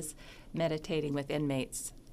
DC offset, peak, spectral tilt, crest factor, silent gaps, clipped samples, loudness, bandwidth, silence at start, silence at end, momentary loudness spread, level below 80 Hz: under 0.1%; -20 dBFS; -5 dB/octave; 16 dB; none; under 0.1%; -35 LUFS; 15.5 kHz; 0 s; 0 s; 10 LU; -54 dBFS